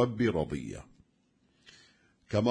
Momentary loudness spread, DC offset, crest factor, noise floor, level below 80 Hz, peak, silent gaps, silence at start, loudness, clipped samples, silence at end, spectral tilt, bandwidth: 15 LU; under 0.1%; 20 dB; -71 dBFS; -56 dBFS; -14 dBFS; none; 0 s; -32 LUFS; under 0.1%; 0 s; -7 dB/octave; 10.5 kHz